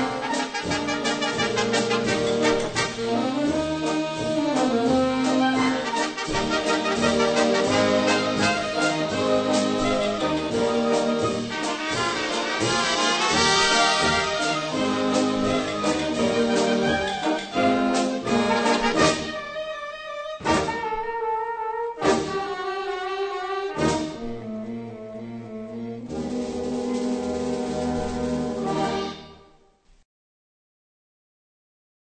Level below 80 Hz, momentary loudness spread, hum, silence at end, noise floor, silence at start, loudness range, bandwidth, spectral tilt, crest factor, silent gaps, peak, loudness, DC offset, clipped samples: -48 dBFS; 11 LU; none; 2.7 s; -57 dBFS; 0 s; 9 LU; 9.2 kHz; -3.5 dB/octave; 20 dB; none; -4 dBFS; -23 LUFS; under 0.1%; under 0.1%